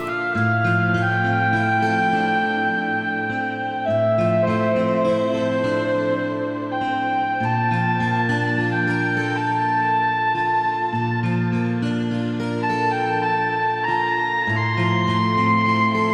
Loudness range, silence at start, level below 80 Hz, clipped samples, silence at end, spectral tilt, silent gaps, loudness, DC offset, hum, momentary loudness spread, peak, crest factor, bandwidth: 2 LU; 0 s; -58 dBFS; under 0.1%; 0 s; -7 dB/octave; none; -20 LUFS; under 0.1%; none; 4 LU; -6 dBFS; 14 dB; 9.8 kHz